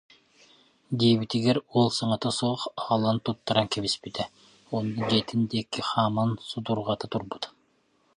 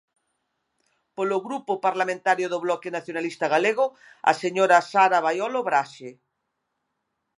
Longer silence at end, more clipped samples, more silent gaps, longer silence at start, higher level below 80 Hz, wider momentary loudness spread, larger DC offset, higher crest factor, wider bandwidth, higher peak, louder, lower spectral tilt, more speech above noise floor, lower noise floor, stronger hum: second, 0.65 s vs 1.25 s; neither; neither; second, 0.9 s vs 1.2 s; first, -62 dBFS vs -82 dBFS; about the same, 10 LU vs 11 LU; neither; about the same, 22 dB vs 22 dB; about the same, 11 kHz vs 11 kHz; second, -6 dBFS vs -2 dBFS; second, -27 LUFS vs -23 LUFS; first, -5.5 dB/octave vs -4 dB/octave; second, 41 dB vs 55 dB; second, -67 dBFS vs -78 dBFS; neither